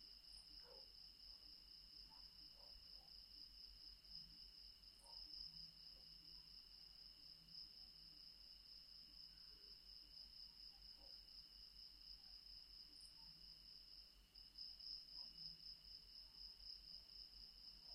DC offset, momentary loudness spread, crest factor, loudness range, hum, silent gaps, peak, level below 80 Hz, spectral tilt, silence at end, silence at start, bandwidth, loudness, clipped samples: under 0.1%; 6 LU; 20 dB; 3 LU; none; none; -42 dBFS; -74 dBFS; -2 dB/octave; 0 s; 0 s; 16 kHz; -58 LUFS; under 0.1%